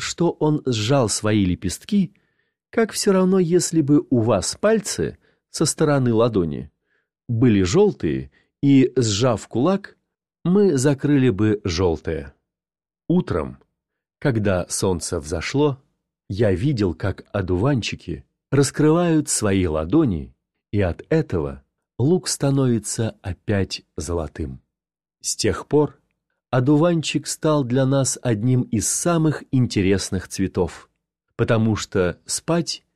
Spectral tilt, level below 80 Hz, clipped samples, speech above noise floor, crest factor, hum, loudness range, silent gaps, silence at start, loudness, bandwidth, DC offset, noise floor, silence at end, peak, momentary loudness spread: -5.5 dB/octave; -44 dBFS; under 0.1%; over 70 dB; 16 dB; none; 5 LU; none; 0 s; -21 LUFS; 14 kHz; under 0.1%; under -90 dBFS; 0.15 s; -6 dBFS; 10 LU